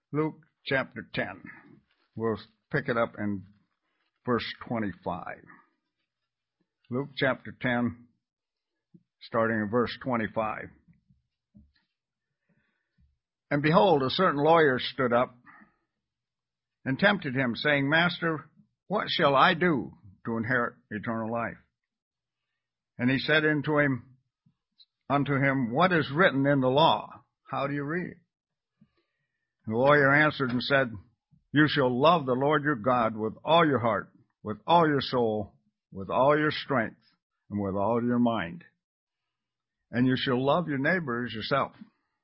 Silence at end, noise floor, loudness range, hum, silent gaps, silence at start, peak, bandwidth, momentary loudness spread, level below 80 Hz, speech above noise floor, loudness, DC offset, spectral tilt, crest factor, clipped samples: 0.55 s; under -90 dBFS; 9 LU; none; 22.02-22.11 s, 37.22-37.30 s, 38.84-39.07 s; 0.1 s; -8 dBFS; 5.8 kHz; 14 LU; -62 dBFS; over 64 dB; -27 LUFS; under 0.1%; -10 dB/octave; 22 dB; under 0.1%